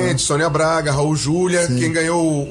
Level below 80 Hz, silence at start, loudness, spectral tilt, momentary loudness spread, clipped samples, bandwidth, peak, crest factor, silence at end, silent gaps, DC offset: -42 dBFS; 0 s; -17 LUFS; -4.5 dB/octave; 2 LU; under 0.1%; 11.5 kHz; -8 dBFS; 10 dB; 0 s; none; under 0.1%